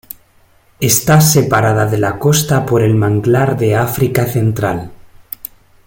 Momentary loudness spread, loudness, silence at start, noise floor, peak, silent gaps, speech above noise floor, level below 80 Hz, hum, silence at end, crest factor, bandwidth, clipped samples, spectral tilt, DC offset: 18 LU; -13 LUFS; 0.8 s; -50 dBFS; 0 dBFS; none; 38 dB; -42 dBFS; none; 0.8 s; 14 dB; 17 kHz; under 0.1%; -5 dB/octave; under 0.1%